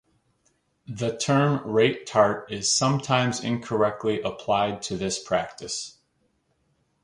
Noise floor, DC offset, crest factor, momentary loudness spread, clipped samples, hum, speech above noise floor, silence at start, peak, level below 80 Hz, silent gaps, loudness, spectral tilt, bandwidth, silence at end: -70 dBFS; under 0.1%; 20 dB; 10 LU; under 0.1%; none; 46 dB; 0.9 s; -4 dBFS; -60 dBFS; none; -24 LUFS; -4 dB/octave; 11.5 kHz; 1.15 s